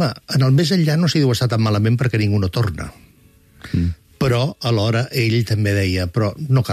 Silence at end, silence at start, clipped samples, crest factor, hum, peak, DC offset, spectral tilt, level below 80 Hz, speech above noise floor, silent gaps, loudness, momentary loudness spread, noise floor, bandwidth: 0 s; 0 s; under 0.1%; 12 dB; none; -6 dBFS; under 0.1%; -6.5 dB/octave; -44 dBFS; 34 dB; none; -18 LUFS; 6 LU; -51 dBFS; 15 kHz